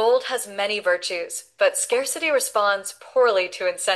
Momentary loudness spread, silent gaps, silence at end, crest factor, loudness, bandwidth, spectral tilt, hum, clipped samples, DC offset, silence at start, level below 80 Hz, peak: 7 LU; none; 0 s; 14 dB; -22 LUFS; 12.5 kHz; 0 dB/octave; none; under 0.1%; under 0.1%; 0 s; -76 dBFS; -8 dBFS